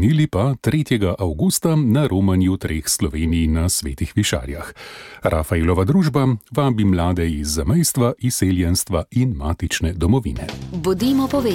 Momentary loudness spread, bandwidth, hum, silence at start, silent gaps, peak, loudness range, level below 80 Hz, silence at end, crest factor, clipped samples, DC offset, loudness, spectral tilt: 7 LU; 17 kHz; none; 0 s; none; -4 dBFS; 2 LU; -32 dBFS; 0 s; 14 dB; under 0.1%; under 0.1%; -19 LUFS; -5.5 dB/octave